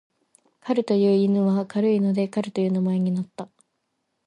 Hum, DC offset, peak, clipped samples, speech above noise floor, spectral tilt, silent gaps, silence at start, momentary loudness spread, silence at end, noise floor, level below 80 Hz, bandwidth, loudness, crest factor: none; under 0.1%; -10 dBFS; under 0.1%; 54 dB; -8.5 dB/octave; none; 0.65 s; 15 LU; 0.8 s; -76 dBFS; -72 dBFS; 10.5 kHz; -22 LUFS; 14 dB